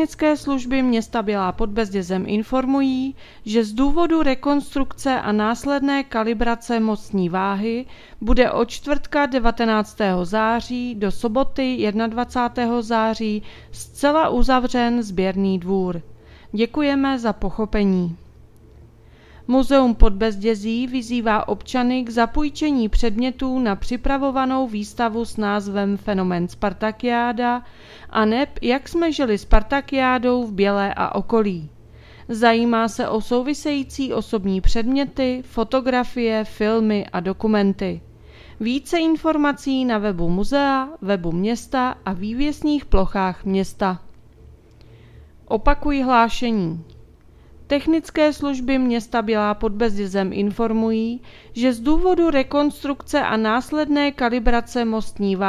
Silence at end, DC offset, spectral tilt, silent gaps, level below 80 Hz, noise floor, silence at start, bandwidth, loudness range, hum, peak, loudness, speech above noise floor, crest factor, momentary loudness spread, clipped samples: 0 s; under 0.1%; -6 dB/octave; none; -32 dBFS; -47 dBFS; 0 s; 13.5 kHz; 2 LU; none; 0 dBFS; -21 LUFS; 28 dB; 20 dB; 6 LU; under 0.1%